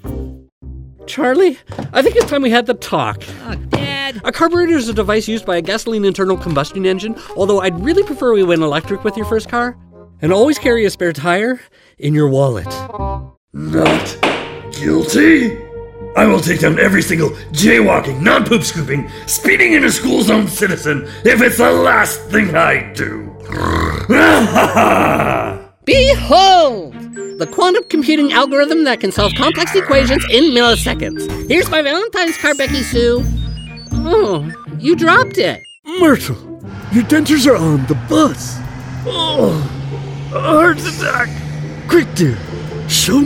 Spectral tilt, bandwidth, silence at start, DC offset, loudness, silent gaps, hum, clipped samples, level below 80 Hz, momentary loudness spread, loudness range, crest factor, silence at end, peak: -4.5 dB/octave; 16.5 kHz; 0.05 s; under 0.1%; -13 LUFS; 0.52-0.61 s, 13.37-13.48 s, 35.79-35.83 s; none; under 0.1%; -32 dBFS; 14 LU; 4 LU; 14 dB; 0 s; 0 dBFS